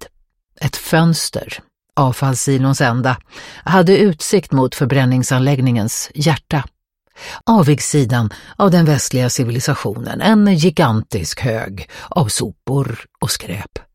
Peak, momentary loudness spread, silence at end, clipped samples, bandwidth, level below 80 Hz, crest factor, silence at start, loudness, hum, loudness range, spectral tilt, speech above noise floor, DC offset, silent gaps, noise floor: 0 dBFS; 12 LU; 0.15 s; under 0.1%; 16.5 kHz; -44 dBFS; 16 dB; 0 s; -16 LUFS; none; 2 LU; -5.5 dB/octave; 43 dB; under 0.1%; none; -58 dBFS